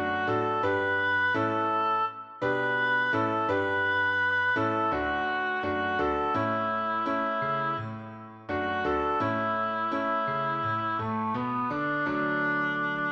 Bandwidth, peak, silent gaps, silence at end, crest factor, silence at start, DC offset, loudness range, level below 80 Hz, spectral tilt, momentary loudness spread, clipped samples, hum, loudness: 7.8 kHz; -16 dBFS; none; 0 s; 12 dB; 0 s; under 0.1%; 3 LU; -56 dBFS; -7 dB/octave; 5 LU; under 0.1%; none; -27 LUFS